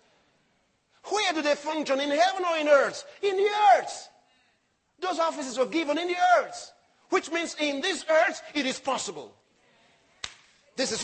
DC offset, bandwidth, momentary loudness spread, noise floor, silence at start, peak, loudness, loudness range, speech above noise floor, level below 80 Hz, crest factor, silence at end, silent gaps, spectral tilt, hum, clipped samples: under 0.1%; 8.8 kHz; 18 LU; -71 dBFS; 1.05 s; -8 dBFS; -26 LUFS; 5 LU; 45 dB; -74 dBFS; 20 dB; 0 s; none; -2 dB/octave; none; under 0.1%